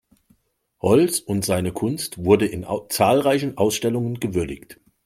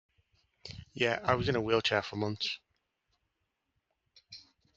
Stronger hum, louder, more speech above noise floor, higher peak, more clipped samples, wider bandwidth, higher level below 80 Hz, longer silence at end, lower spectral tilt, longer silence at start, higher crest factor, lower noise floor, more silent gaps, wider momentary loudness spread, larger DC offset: neither; first, -21 LUFS vs -31 LUFS; second, 45 dB vs 52 dB; first, -2 dBFS vs -12 dBFS; neither; first, 16.5 kHz vs 8 kHz; first, -52 dBFS vs -62 dBFS; about the same, 0.3 s vs 0.35 s; about the same, -5 dB/octave vs -5 dB/octave; first, 0.85 s vs 0.65 s; about the same, 20 dB vs 24 dB; second, -65 dBFS vs -83 dBFS; neither; second, 9 LU vs 23 LU; neither